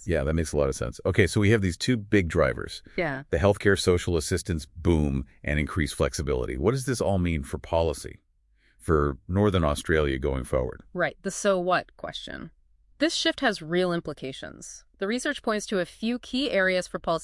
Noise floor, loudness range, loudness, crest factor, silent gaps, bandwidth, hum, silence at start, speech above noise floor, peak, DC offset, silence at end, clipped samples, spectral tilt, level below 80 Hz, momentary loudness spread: -64 dBFS; 4 LU; -26 LUFS; 22 dB; none; 12 kHz; none; 0 s; 39 dB; -4 dBFS; under 0.1%; 0 s; under 0.1%; -5.5 dB/octave; -40 dBFS; 12 LU